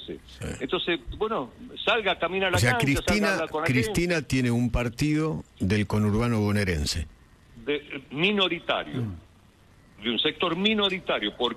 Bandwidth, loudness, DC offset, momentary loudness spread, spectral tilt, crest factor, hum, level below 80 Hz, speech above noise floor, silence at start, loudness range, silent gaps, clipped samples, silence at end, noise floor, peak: 13.5 kHz; -26 LUFS; under 0.1%; 11 LU; -5 dB/octave; 18 dB; none; -44 dBFS; 30 dB; 0 s; 4 LU; none; under 0.1%; 0 s; -56 dBFS; -8 dBFS